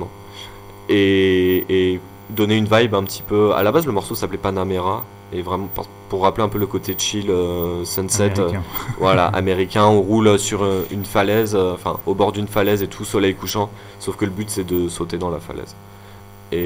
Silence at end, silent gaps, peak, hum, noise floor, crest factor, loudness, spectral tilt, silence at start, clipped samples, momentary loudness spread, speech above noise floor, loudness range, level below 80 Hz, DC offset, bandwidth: 0 s; none; 0 dBFS; none; -40 dBFS; 18 dB; -19 LUFS; -5 dB/octave; 0 s; under 0.1%; 13 LU; 21 dB; 5 LU; -44 dBFS; under 0.1%; 16 kHz